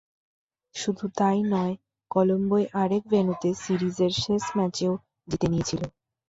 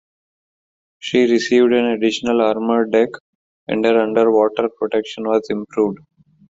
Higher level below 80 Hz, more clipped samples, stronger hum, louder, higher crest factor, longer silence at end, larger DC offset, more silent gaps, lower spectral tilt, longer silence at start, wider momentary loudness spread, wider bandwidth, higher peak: about the same, -56 dBFS vs -60 dBFS; neither; neither; second, -26 LUFS vs -17 LUFS; about the same, 18 dB vs 14 dB; second, 0.4 s vs 0.6 s; neither; second, none vs 3.20-3.67 s; about the same, -6 dB/octave vs -5 dB/octave; second, 0.75 s vs 1.05 s; about the same, 9 LU vs 8 LU; about the same, 8 kHz vs 7.8 kHz; second, -8 dBFS vs -2 dBFS